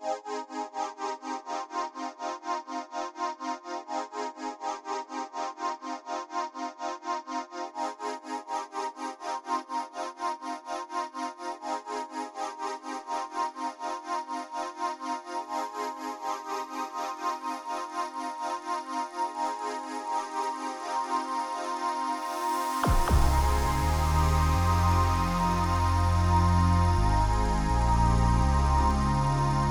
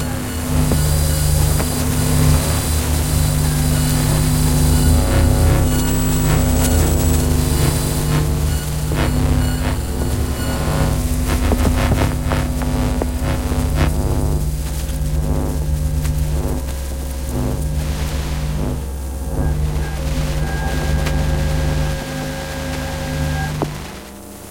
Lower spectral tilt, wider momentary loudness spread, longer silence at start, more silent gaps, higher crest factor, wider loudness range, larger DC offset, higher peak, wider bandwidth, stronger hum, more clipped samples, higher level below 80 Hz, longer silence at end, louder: about the same, -5.5 dB/octave vs -5.5 dB/octave; first, 11 LU vs 8 LU; about the same, 0 s vs 0 s; neither; about the same, 18 dB vs 16 dB; first, 10 LU vs 6 LU; neither; second, -12 dBFS vs -2 dBFS; first, over 20 kHz vs 16.5 kHz; second, none vs 50 Hz at -25 dBFS; neither; second, -34 dBFS vs -22 dBFS; about the same, 0 s vs 0 s; second, -30 LUFS vs -19 LUFS